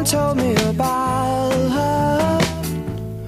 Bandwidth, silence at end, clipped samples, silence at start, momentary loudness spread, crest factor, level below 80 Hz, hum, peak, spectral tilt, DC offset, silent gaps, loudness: 15.5 kHz; 0 s; under 0.1%; 0 s; 7 LU; 18 dB; -38 dBFS; none; 0 dBFS; -5 dB/octave; under 0.1%; none; -19 LUFS